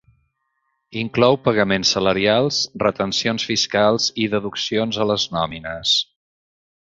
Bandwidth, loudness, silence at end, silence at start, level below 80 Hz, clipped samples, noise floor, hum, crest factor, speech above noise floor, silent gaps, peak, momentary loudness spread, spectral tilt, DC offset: 7.8 kHz; -19 LUFS; 0.9 s; 0.9 s; -52 dBFS; under 0.1%; -72 dBFS; none; 18 dB; 52 dB; none; -2 dBFS; 7 LU; -3.5 dB/octave; under 0.1%